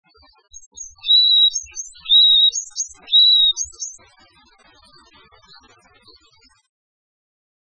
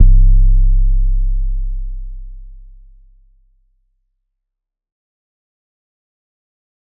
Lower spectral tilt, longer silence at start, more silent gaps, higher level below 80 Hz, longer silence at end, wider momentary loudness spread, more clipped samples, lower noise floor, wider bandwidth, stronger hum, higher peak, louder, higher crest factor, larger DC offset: second, 4 dB/octave vs -14.5 dB/octave; first, 0.8 s vs 0 s; neither; second, -58 dBFS vs -14 dBFS; second, 3.7 s vs 4.35 s; about the same, 21 LU vs 22 LU; second, under 0.1% vs 0.1%; second, -56 dBFS vs -80 dBFS; first, 8.6 kHz vs 0.4 kHz; neither; second, -6 dBFS vs 0 dBFS; first, -12 LUFS vs -18 LUFS; about the same, 14 dB vs 14 dB; neither